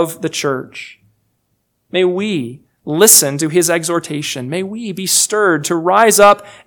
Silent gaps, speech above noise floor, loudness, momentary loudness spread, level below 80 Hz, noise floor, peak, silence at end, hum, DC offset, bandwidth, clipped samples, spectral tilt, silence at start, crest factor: none; 52 dB; -13 LUFS; 15 LU; -56 dBFS; -66 dBFS; 0 dBFS; 0.15 s; none; under 0.1%; over 20 kHz; 0.4%; -2.5 dB/octave; 0 s; 14 dB